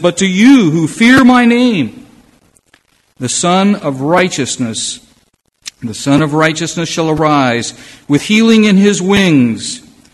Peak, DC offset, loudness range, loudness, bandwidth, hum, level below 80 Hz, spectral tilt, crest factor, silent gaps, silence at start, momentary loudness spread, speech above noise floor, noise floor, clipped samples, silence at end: 0 dBFS; under 0.1%; 5 LU; -10 LUFS; 12.5 kHz; none; -46 dBFS; -4.5 dB/octave; 12 dB; none; 0 s; 15 LU; 45 dB; -55 dBFS; 0.3%; 0.35 s